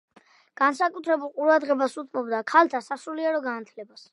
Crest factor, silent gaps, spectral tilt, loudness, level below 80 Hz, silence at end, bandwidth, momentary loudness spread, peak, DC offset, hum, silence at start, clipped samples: 22 dB; none; -3.5 dB/octave; -24 LUFS; -86 dBFS; 0.3 s; 11.5 kHz; 13 LU; -4 dBFS; under 0.1%; none; 0.6 s; under 0.1%